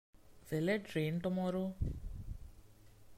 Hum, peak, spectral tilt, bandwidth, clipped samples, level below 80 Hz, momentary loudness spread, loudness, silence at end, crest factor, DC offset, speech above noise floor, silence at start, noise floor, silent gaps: none; -22 dBFS; -7 dB/octave; 16 kHz; under 0.1%; -50 dBFS; 14 LU; -38 LUFS; 0 s; 16 dB; under 0.1%; 23 dB; 0.2 s; -59 dBFS; none